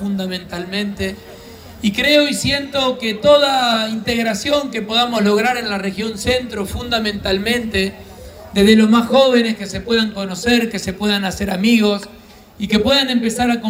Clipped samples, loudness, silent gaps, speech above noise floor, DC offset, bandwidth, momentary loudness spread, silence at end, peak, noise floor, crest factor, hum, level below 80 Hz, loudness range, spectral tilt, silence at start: under 0.1%; -16 LUFS; none; 20 dB; under 0.1%; 16 kHz; 12 LU; 0 s; 0 dBFS; -37 dBFS; 16 dB; none; -42 dBFS; 3 LU; -4.5 dB/octave; 0 s